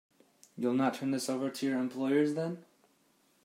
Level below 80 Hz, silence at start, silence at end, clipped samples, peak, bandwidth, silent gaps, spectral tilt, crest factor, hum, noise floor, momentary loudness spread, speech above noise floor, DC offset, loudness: -84 dBFS; 0.55 s; 0.8 s; under 0.1%; -16 dBFS; 16 kHz; none; -5.5 dB/octave; 16 dB; none; -70 dBFS; 9 LU; 38 dB; under 0.1%; -32 LUFS